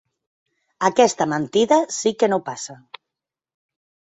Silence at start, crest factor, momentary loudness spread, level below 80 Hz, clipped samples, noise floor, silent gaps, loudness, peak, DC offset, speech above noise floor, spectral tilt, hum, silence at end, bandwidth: 0.8 s; 20 dB; 13 LU; -66 dBFS; under 0.1%; -86 dBFS; none; -19 LUFS; -2 dBFS; under 0.1%; 66 dB; -4 dB/octave; none; 1.45 s; 8.4 kHz